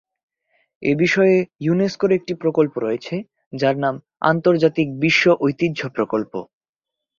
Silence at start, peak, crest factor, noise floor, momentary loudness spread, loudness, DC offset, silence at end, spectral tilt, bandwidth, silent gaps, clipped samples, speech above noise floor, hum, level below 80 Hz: 0.8 s; -2 dBFS; 18 dB; -85 dBFS; 10 LU; -19 LUFS; under 0.1%; 0.75 s; -6.5 dB/octave; 7.4 kHz; 3.46-3.51 s; under 0.1%; 67 dB; none; -60 dBFS